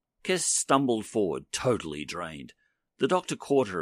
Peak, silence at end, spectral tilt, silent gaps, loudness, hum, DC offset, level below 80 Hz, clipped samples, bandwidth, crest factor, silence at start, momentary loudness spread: -10 dBFS; 0 s; -3.5 dB/octave; none; -28 LUFS; none; under 0.1%; -62 dBFS; under 0.1%; 15 kHz; 20 dB; 0.25 s; 11 LU